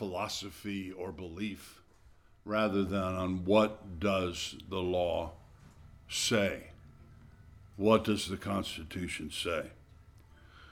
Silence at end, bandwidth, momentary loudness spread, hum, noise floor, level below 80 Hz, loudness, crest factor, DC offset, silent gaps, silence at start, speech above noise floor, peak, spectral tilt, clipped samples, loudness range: 0 s; 18 kHz; 14 LU; none; -60 dBFS; -56 dBFS; -33 LUFS; 24 dB; under 0.1%; none; 0 s; 27 dB; -12 dBFS; -4.5 dB/octave; under 0.1%; 3 LU